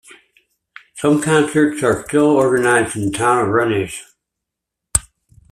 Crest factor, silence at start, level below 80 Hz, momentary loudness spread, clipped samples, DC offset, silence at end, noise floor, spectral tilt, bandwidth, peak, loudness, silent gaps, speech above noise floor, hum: 18 dB; 0.95 s; -44 dBFS; 8 LU; under 0.1%; under 0.1%; 0.5 s; -81 dBFS; -4.5 dB/octave; 14.5 kHz; 0 dBFS; -16 LUFS; none; 66 dB; none